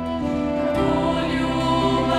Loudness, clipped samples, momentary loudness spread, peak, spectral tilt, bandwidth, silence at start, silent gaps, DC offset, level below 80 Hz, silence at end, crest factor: -21 LUFS; under 0.1%; 4 LU; -8 dBFS; -6.5 dB/octave; 12.5 kHz; 0 s; none; under 0.1%; -38 dBFS; 0 s; 12 dB